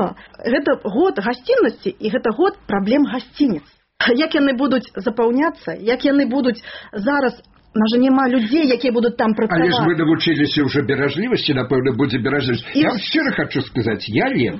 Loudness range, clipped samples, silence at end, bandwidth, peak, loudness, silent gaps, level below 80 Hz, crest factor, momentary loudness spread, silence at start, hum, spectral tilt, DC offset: 2 LU; under 0.1%; 0 s; 6 kHz; -4 dBFS; -18 LUFS; none; -52 dBFS; 14 dB; 6 LU; 0 s; none; -4 dB/octave; under 0.1%